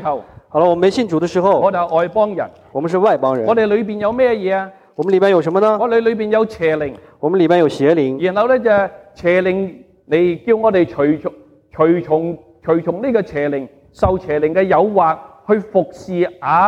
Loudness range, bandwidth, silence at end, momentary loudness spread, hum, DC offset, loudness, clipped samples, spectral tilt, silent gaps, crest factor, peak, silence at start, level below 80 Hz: 2 LU; 9.4 kHz; 0 s; 10 LU; none; under 0.1%; -16 LUFS; under 0.1%; -7.5 dB/octave; none; 14 dB; -2 dBFS; 0 s; -44 dBFS